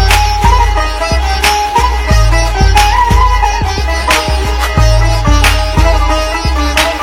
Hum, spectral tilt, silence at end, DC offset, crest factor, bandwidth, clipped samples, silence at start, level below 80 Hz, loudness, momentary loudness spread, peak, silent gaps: none; -4 dB/octave; 0 s; under 0.1%; 10 dB; 16 kHz; 1%; 0 s; -12 dBFS; -11 LUFS; 5 LU; 0 dBFS; none